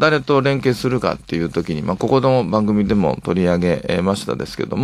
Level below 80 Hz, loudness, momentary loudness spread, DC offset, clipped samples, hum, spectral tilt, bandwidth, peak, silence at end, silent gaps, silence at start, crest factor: -44 dBFS; -18 LUFS; 7 LU; under 0.1%; under 0.1%; none; -7 dB/octave; 14 kHz; 0 dBFS; 0 s; none; 0 s; 16 dB